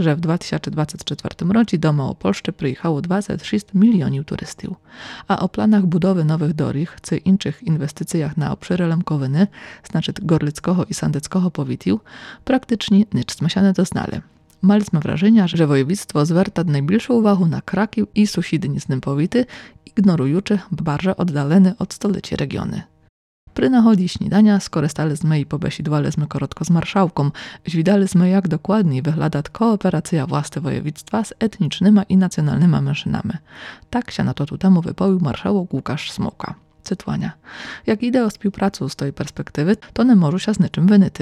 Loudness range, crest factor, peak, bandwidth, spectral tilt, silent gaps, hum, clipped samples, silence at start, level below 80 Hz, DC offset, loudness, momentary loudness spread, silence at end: 3 LU; 14 dB; -4 dBFS; 12.5 kHz; -7 dB/octave; 23.09-23.47 s; none; under 0.1%; 0 s; -48 dBFS; under 0.1%; -19 LUFS; 11 LU; 0 s